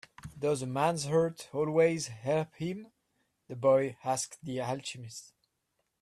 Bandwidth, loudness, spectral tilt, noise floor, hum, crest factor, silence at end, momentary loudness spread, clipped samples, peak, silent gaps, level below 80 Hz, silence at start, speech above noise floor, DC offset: 14 kHz; -31 LUFS; -5 dB/octave; -80 dBFS; none; 18 dB; 0.75 s; 17 LU; under 0.1%; -14 dBFS; none; -68 dBFS; 0.25 s; 50 dB; under 0.1%